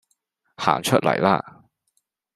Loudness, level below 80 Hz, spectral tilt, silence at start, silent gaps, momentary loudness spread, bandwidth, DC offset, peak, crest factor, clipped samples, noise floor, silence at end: -21 LUFS; -64 dBFS; -5 dB/octave; 0.6 s; none; 6 LU; 15 kHz; under 0.1%; -2 dBFS; 22 dB; under 0.1%; -72 dBFS; 0.85 s